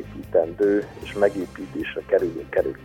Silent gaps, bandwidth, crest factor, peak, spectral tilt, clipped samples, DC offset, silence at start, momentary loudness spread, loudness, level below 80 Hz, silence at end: none; 16 kHz; 18 dB; -4 dBFS; -6.5 dB/octave; under 0.1%; under 0.1%; 0 s; 10 LU; -24 LUFS; -48 dBFS; 0 s